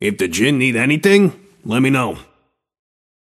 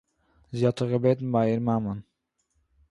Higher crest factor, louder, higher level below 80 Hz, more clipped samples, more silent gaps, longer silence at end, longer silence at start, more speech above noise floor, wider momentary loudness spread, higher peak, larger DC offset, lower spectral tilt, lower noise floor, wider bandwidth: about the same, 18 dB vs 18 dB; first, -15 LUFS vs -26 LUFS; first, -54 dBFS vs -60 dBFS; neither; neither; first, 1.05 s vs 0.9 s; second, 0 s vs 0.5 s; second, 46 dB vs 50 dB; about the same, 11 LU vs 12 LU; first, 0 dBFS vs -10 dBFS; neither; second, -5 dB/octave vs -8.5 dB/octave; second, -61 dBFS vs -75 dBFS; first, 15 kHz vs 11 kHz